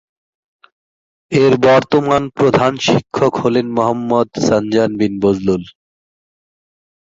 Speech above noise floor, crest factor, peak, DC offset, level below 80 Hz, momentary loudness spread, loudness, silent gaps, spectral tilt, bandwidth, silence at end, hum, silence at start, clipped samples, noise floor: over 76 dB; 16 dB; 0 dBFS; under 0.1%; -48 dBFS; 6 LU; -14 LUFS; none; -6 dB/octave; 7.8 kHz; 1.35 s; none; 1.3 s; under 0.1%; under -90 dBFS